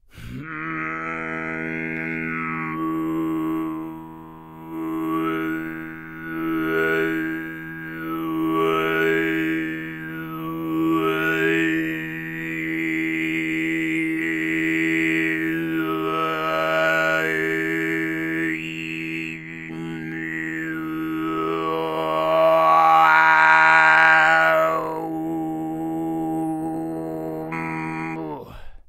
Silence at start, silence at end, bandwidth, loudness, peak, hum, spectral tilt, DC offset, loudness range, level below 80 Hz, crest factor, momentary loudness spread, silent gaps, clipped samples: 0.15 s; 0.1 s; 16 kHz; -21 LUFS; 0 dBFS; none; -5.5 dB/octave; under 0.1%; 12 LU; -54 dBFS; 22 dB; 17 LU; none; under 0.1%